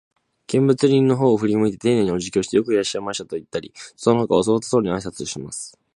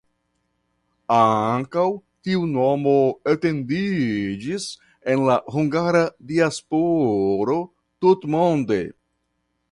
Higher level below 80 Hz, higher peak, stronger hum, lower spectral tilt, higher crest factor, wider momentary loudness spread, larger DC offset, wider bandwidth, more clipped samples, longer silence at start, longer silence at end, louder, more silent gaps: about the same, -54 dBFS vs -58 dBFS; about the same, -2 dBFS vs -4 dBFS; neither; about the same, -6 dB/octave vs -6.5 dB/octave; about the same, 18 dB vs 18 dB; first, 13 LU vs 9 LU; neither; about the same, 11.5 kHz vs 11.5 kHz; neither; second, 0.5 s vs 1.1 s; second, 0.3 s vs 0.8 s; about the same, -20 LUFS vs -21 LUFS; neither